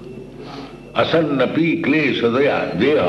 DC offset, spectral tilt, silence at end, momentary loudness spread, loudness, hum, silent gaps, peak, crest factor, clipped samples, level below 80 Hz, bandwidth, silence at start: under 0.1%; -7 dB/octave; 0 s; 18 LU; -17 LUFS; none; none; -4 dBFS; 14 dB; under 0.1%; -50 dBFS; 8.2 kHz; 0 s